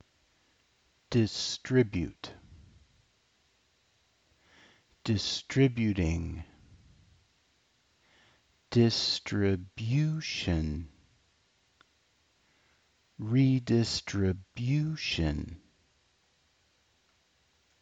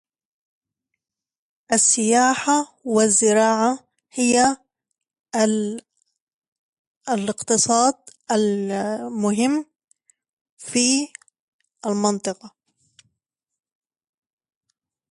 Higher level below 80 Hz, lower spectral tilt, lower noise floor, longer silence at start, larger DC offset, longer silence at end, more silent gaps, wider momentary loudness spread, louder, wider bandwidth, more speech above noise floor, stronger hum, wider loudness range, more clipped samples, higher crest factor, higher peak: first, -50 dBFS vs -66 dBFS; first, -6 dB/octave vs -3 dB/octave; second, -70 dBFS vs -82 dBFS; second, 1.1 s vs 1.7 s; neither; second, 2.25 s vs 2.65 s; second, none vs 5.20-5.24 s, 6.20-6.27 s, 6.33-6.42 s, 6.48-7.01 s, 10.29-10.57 s, 11.40-11.59 s; about the same, 15 LU vs 16 LU; second, -30 LUFS vs -20 LUFS; second, 8 kHz vs 11.5 kHz; second, 41 dB vs 62 dB; neither; second, 6 LU vs 9 LU; neither; about the same, 20 dB vs 18 dB; second, -12 dBFS vs -4 dBFS